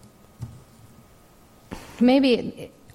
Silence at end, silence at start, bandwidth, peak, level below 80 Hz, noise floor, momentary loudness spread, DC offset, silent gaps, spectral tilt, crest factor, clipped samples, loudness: 0.3 s; 0.4 s; 13.5 kHz; -8 dBFS; -54 dBFS; -53 dBFS; 24 LU; under 0.1%; none; -6 dB/octave; 18 dB; under 0.1%; -20 LUFS